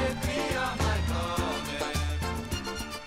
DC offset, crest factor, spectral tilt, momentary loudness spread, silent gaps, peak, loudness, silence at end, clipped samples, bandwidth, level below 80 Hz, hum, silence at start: under 0.1%; 16 dB; -4.5 dB/octave; 5 LU; none; -14 dBFS; -30 LUFS; 0 s; under 0.1%; 16 kHz; -36 dBFS; none; 0 s